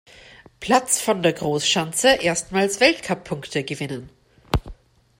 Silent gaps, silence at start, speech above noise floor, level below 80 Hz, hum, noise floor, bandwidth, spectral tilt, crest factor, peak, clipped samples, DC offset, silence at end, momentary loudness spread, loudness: none; 0.6 s; 26 dB; -40 dBFS; none; -47 dBFS; 16.5 kHz; -3 dB/octave; 20 dB; -2 dBFS; under 0.1%; under 0.1%; 0.45 s; 11 LU; -21 LUFS